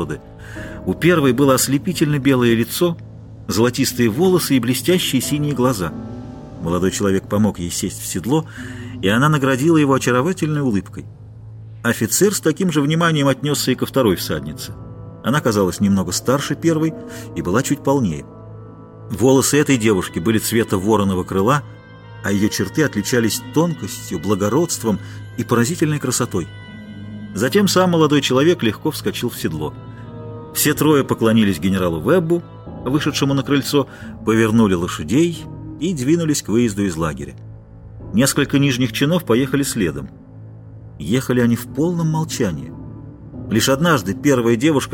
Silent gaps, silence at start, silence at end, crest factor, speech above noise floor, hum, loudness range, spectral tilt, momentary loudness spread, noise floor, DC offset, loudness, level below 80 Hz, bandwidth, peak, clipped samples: none; 0 s; 0 s; 16 dB; 20 dB; none; 3 LU; -5 dB/octave; 18 LU; -37 dBFS; under 0.1%; -18 LUFS; -44 dBFS; 17 kHz; -2 dBFS; under 0.1%